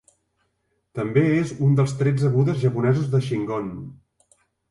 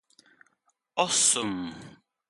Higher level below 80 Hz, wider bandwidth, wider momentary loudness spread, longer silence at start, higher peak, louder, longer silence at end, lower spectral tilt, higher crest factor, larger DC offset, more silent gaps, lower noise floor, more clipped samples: first, -56 dBFS vs -68 dBFS; about the same, 11 kHz vs 12 kHz; second, 13 LU vs 18 LU; about the same, 0.95 s vs 0.95 s; about the same, -6 dBFS vs -8 dBFS; first, -22 LUFS vs -25 LUFS; first, 0.75 s vs 0.4 s; first, -8 dB/octave vs -1 dB/octave; second, 16 dB vs 22 dB; neither; neither; about the same, -72 dBFS vs -73 dBFS; neither